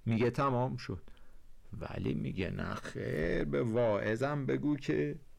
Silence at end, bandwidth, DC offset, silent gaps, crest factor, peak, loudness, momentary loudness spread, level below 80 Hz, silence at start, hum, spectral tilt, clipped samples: 0.05 s; 12.5 kHz; under 0.1%; none; 10 dB; -24 dBFS; -34 LUFS; 12 LU; -50 dBFS; 0.05 s; none; -7.5 dB/octave; under 0.1%